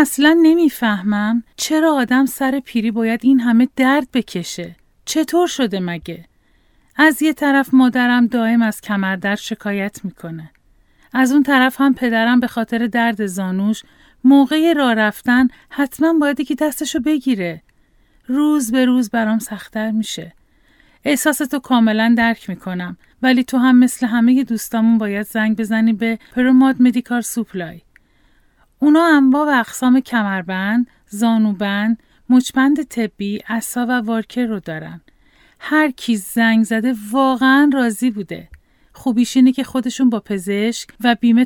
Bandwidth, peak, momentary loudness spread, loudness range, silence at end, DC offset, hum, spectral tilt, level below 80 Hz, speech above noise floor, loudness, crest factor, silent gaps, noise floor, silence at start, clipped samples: 18 kHz; 0 dBFS; 13 LU; 4 LU; 0 s; under 0.1%; none; -4.5 dB/octave; -54 dBFS; 40 dB; -16 LUFS; 16 dB; none; -55 dBFS; 0 s; under 0.1%